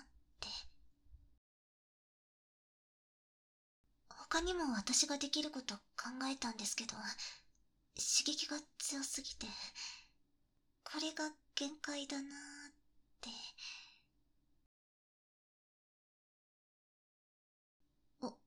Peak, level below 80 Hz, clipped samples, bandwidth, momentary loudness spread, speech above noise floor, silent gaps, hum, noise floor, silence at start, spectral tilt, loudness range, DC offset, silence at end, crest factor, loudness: -18 dBFS; -68 dBFS; under 0.1%; 18 kHz; 19 LU; 36 dB; 1.38-3.84 s, 14.66-17.80 s; none; -78 dBFS; 0 s; -1 dB/octave; 16 LU; under 0.1%; 0.1 s; 26 dB; -41 LUFS